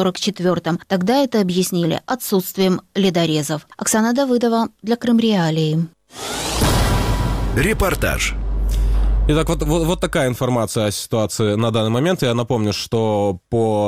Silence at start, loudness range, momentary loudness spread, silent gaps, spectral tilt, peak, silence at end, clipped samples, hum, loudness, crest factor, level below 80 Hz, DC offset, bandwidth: 0 s; 1 LU; 5 LU; none; -5 dB/octave; -6 dBFS; 0 s; under 0.1%; none; -19 LUFS; 12 dB; -26 dBFS; under 0.1%; 16.5 kHz